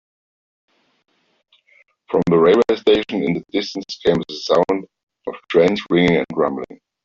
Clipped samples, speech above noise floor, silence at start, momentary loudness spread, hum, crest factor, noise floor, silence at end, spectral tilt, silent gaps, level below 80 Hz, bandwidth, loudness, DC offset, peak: under 0.1%; 43 dB; 2.1 s; 14 LU; none; 16 dB; -61 dBFS; 0.3 s; -6.5 dB/octave; 5.03-5.07 s; -54 dBFS; 7.4 kHz; -18 LUFS; under 0.1%; -2 dBFS